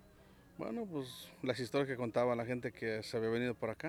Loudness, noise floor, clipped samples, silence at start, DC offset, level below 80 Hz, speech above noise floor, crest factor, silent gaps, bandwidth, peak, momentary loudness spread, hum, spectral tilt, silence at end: -38 LUFS; -62 dBFS; under 0.1%; 0.05 s; under 0.1%; -70 dBFS; 24 dB; 18 dB; none; 19.5 kHz; -20 dBFS; 9 LU; none; -6 dB/octave; 0 s